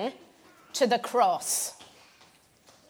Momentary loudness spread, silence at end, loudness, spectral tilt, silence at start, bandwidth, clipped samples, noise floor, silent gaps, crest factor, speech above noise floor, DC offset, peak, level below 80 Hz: 12 LU; 1.05 s; -27 LUFS; -2 dB/octave; 0 s; 19 kHz; under 0.1%; -60 dBFS; none; 20 dB; 33 dB; under 0.1%; -10 dBFS; -80 dBFS